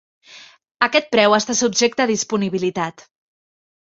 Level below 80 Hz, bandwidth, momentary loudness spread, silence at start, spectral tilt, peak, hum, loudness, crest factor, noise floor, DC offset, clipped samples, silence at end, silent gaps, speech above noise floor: -64 dBFS; 8 kHz; 8 LU; 0.3 s; -3 dB/octave; -2 dBFS; none; -18 LUFS; 20 dB; -45 dBFS; under 0.1%; under 0.1%; 0.95 s; 0.71-0.75 s; 27 dB